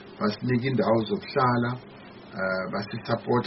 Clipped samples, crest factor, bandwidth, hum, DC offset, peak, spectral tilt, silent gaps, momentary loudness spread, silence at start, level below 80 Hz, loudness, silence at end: under 0.1%; 16 dB; 6 kHz; none; under 0.1%; -10 dBFS; -5.5 dB/octave; none; 14 LU; 0 s; -60 dBFS; -27 LUFS; 0 s